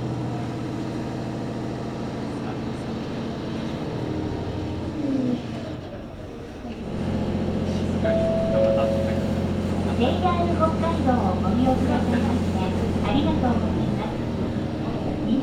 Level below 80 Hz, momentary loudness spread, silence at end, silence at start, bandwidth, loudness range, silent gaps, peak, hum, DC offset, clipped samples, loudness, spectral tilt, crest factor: -42 dBFS; 9 LU; 0 s; 0 s; 11.5 kHz; 7 LU; none; -8 dBFS; none; under 0.1%; under 0.1%; -25 LUFS; -7.5 dB/octave; 16 dB